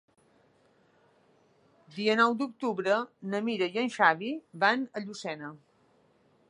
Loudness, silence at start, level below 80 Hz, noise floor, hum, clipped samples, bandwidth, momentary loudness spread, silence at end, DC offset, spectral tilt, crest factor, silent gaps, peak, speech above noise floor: -29 LUFS; 1.9 s; -84 dBFS; -66 dBFS; none; under 0.1%; 11 kHz; 13 LU; 0.95 s; under 0.1%; -4.5 dB/octave; 24 dB; none; -8 dBFS; 37 dB